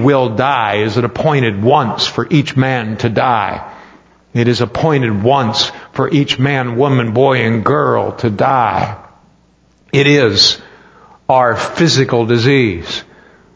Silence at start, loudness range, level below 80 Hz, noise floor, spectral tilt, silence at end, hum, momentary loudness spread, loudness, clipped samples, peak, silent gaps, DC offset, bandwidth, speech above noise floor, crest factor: 0 s; 3 LU; -44 dBFS; -52 dBFS; -5.5 dB/octave; 0.55 s; none; 8 LU; -13 LUFS; under 0.1%; 0 dBFS; none; under 0.1%; 8 kHz; 39 dB; 14 dB